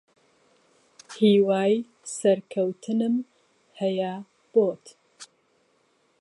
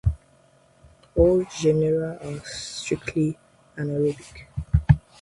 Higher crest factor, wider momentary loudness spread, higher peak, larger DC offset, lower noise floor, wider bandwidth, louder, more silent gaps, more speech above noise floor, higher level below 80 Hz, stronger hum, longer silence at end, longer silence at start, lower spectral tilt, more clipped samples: second, 18 dB vs 24 dB; about the same, 17 LU vs 17 LU; second, -8 dBFS vs -2 dBFS; neither; first, -67 dBFS vs -58 dBFS; about the same, 11.5 kHz vs 11.5 kHz; about the same, -25 LUFS vs -24 LUFS; neither; first, 44 dB vs 34 dB; second, -78 dBFS vs -36 dBFS; neither; first, 0.95 s vs 0.2 s; first, 1.1 s vs 0.05 s; about the same, -6 dB/octave vs -7 dB/octave; neither